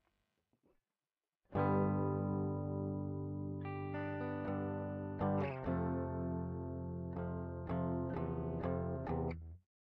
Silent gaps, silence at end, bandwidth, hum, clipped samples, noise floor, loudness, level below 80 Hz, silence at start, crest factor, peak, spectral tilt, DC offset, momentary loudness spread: none; 0.25 s; 5 kHz; none; under 0.1%; under -90 dBFS; -40 LUFS; -58 dBFS; 1.5 s; 16 dB; -24 dBFS; -9 dB/octave; under 0.1%; 7 LU